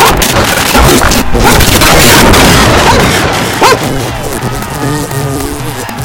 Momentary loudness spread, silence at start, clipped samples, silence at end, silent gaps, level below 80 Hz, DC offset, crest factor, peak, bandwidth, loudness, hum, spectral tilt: 12 LU; 0 s; 5%; 0 s; none; -16 dBFS; under 0.1%; 6 dB; 0 dBFS; over 20 kHz; -6 LUFS; none; -3.5 dB/octave